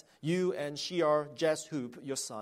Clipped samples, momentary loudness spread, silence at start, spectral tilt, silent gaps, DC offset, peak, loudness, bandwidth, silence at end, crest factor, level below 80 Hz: under 0.1%; 9 LU; 0.25 s; -4.5 dB/octave; none; under 0.1%; -16 dBFS; -33 LUFS; 16 kHz; 0 s; 16 dB; -80 dBFS